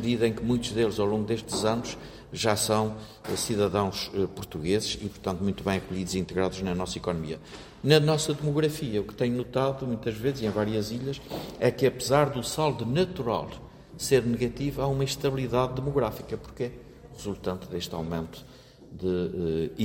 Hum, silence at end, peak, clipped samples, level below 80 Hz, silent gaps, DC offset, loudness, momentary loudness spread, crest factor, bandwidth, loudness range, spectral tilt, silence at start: none; 0 s; -6 dBFS; under 0.1%; -50 dBFS; none; under 0.1%; -28 LUFS; 13 LU; 22 dB; 16.5 kHz; 4 LU; -5 dB/octave; 0 s